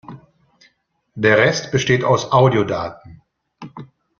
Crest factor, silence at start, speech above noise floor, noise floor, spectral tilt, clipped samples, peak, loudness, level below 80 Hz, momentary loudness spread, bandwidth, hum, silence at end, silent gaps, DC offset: 18 dB; 0.1 s; 47 dB; -63 dBFS; -5.5 dB/octave; under 0.1%; -2 dBFS; -16 LUFS; -52 dBFS; 22 LU; 7.2 kHz; none; 0.35 s; none; under 0.1%